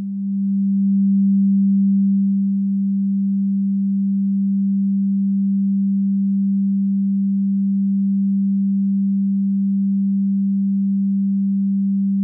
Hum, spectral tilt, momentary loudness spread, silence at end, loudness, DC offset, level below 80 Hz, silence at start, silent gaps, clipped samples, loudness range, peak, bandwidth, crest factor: none; -16 dB/octave; 3 LU; 0 s; -19 LUFS; under 0.1%; -90 dBFS; 0 s; none; under 0.1%; 1 LU; -12 dBFS; 0.3 kHz; 6 dB